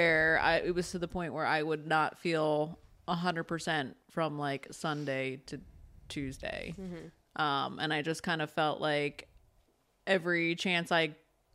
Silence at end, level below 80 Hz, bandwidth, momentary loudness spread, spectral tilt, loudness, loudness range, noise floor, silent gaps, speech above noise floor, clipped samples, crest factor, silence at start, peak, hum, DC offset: 0.4 s; -60 dBFS; 15 kHz; 14 LU; -5 dB/octave; -32 LUFS; 5 LU; -71 dBFS; none; 38 dB; under 0.1%; 20 dB; 0 s; -14 dBFS; none; under 0.1%